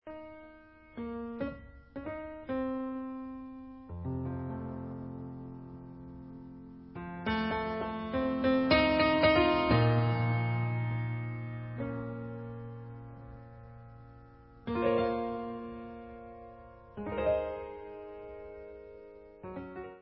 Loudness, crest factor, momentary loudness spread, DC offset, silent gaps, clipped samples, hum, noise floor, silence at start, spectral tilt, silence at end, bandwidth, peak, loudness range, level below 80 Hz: -32 LUFS; 22 dB; 23 LU; under 0.1%; none; under 0.1%; none; -56 dBFS; 0.05 s; -5 dB/octave; 0 s; 5.6 kHz; -12 dBFS; 14 LU; -52 dBFS